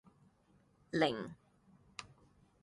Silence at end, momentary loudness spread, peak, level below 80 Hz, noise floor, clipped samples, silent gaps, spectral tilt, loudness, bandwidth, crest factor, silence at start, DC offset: 0.55 s; 25 LU; -18 dBFS; -74 dBFS; -71 dBFS; under 0.1%; none; -5.5 dB/octave; -37 LUFS; 11.5 kHz; 24 dB; 0.95 s; under 0.1%